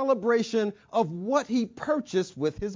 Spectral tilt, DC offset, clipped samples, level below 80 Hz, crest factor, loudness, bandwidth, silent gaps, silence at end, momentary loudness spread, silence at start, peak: -5.5 dB/octave; under 0.1%; under 0.1%; -56 dBFS; 16 dB; -27 LUFS; 7.6 kHz; none; 0 s; 5 LU; 0 s; -12 dBFS